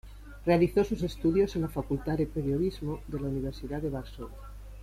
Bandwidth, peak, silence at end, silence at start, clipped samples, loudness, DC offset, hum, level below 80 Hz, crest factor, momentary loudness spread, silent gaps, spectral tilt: 15.5 kHz; -12 dBFS; 0 s; 0.05 s; under 0.1%; -30 LUFS; under 0.1%; none; -44 dBFS; 18 dB; 18 LU; none; -8 dB/octave